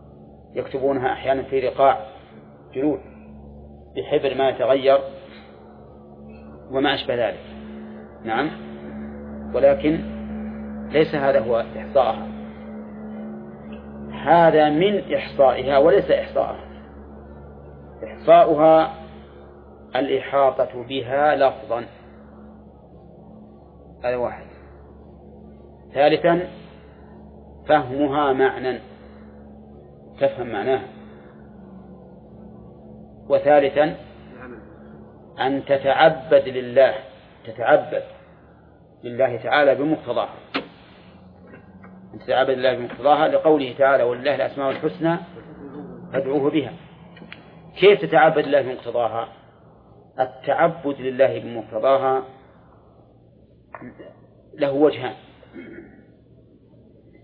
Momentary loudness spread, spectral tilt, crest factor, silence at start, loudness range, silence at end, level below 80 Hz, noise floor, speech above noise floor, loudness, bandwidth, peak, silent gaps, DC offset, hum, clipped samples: 24 LU; -9 dB/octave; 20 dB; 0.2 s; 8 LU; 1.4 s; -50 dBFS; -52 dBFS; 33 dB; -20 LUFS; 5 kHz; -2 dBFS; none; under 0.1%; none; under 0.1%